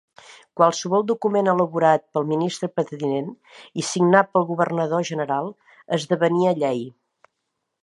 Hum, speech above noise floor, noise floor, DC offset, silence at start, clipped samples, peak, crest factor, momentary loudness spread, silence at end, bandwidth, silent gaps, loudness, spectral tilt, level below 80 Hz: none; 57 dB; -78 dBFS; under 0.1%; 0.3 s; under 0.1%; -2 dBFS; 20 dB; 11 LU; 0.95 s; 11.5 kHz; none; -21 LUFS; -5.5 dB/octave; -74 dBFS